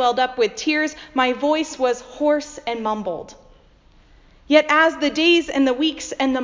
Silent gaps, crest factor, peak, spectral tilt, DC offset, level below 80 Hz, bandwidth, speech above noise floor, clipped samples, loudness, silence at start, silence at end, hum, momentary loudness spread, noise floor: none; 20 dB; 0 dBFS; -3 dB/octave; under 0.1%; -54 dBFS; 7.6 kHz; 32 dB; under 0.1%; -19 LUFS; 0 s; 0 s; none; 9 LU; -52 dBFS